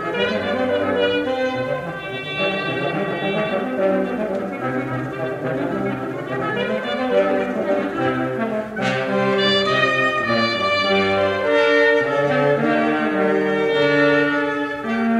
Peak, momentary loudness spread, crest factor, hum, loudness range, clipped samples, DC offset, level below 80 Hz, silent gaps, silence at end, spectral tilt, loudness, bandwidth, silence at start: -4 dBFS; 8 LU; 14 dB; none; 6 LU; under 0.1%; under 0.1%; -56 dBFS; none; 0 s; -6 dB/octave; -20 LUFS; 12.5 kHz; 0 s